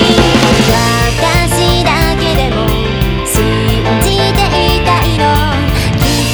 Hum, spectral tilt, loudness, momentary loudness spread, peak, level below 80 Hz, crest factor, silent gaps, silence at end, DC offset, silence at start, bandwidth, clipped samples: none; -4.5 dB/octave; -11 LUFS; 4 LU; 0 dBFS; -18 dBFS; 10 dB; none; 0 s; under 0.1%; 0 s; over 20 kHz; under 0.1%